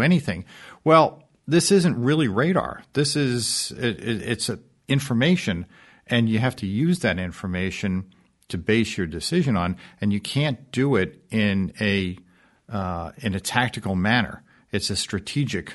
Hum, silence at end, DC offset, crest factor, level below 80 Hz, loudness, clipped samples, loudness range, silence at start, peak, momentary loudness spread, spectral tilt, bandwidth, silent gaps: none; 0 s; under 0.1%; 20 dB; -52 dBFS; -23 LUFS; under 0.1%; 4 LU; 0 s; -2 dBFS; 11 LU; -5 dB/octave; 11.5 kHz; none